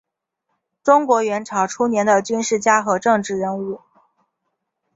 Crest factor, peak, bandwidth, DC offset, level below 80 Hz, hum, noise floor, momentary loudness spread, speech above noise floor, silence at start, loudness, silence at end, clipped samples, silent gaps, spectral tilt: 18 dB; -2 dBFS; 8 kHz; under 0.1%; -64 dBFS; none; -76 dBFS; 9 LU; 58 dB; 0.85 s; -18 LUFS; 1.2 s; under 0.1%; none; -4 dB/octave